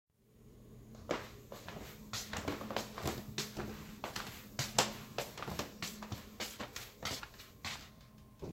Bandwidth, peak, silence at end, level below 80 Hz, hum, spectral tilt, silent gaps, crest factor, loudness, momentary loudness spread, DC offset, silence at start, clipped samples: 16.5 kHz; -12 dBFS; 0 s; -60 dBFS; none; -3 dB/octave; none; 32 dB; -42 LUFS; 16 LU; under 0.1%; 0.25 s; under 0.1%